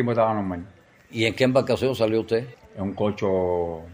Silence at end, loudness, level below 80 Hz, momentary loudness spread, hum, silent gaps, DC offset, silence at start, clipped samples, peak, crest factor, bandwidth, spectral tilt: 0 s; -24 LUFS; -54 dBFS; 12 LU; none; none; under 0.1%; 0 s; under 0.1%; -6 dBFS; 18 dB; 15.5 kHz; -6.5 dB/octave